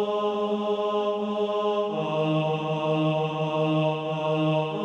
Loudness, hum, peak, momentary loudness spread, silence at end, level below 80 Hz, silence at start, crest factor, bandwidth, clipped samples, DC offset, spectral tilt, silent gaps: -26 LUFS; none; -12 dBFS; 3 LU; 0 s; -70 dBFS; 0 s; 12 dB; 8 kHz; under 0.1%; under 0.1%; -7.5 dB/octave; none